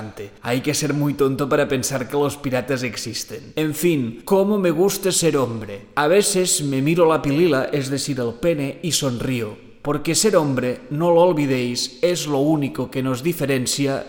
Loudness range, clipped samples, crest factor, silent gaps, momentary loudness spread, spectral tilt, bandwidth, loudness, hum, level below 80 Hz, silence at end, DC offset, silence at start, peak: 3 LU; under 0.1%; 16 dB; none; 9 LU; -4.5 dB/octave; 17 kHz; -20 LUFS; none; -50 dBFS; 0 s; under 0.1%; 0 s; -4 dBFS